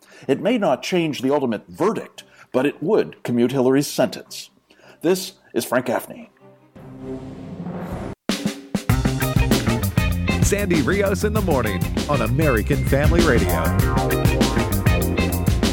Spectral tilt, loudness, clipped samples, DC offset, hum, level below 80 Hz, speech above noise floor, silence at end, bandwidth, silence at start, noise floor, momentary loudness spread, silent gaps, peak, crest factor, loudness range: -5.5 dB/octave; -20 LUFS; under 0.1%; under 0.1%; none; -30 dBFS; 31 dB; 0 s; 18 kHz; 0.2 s; -50 dBFS; 13 LU; none; -4 dBFS; 16 dB; 8 LU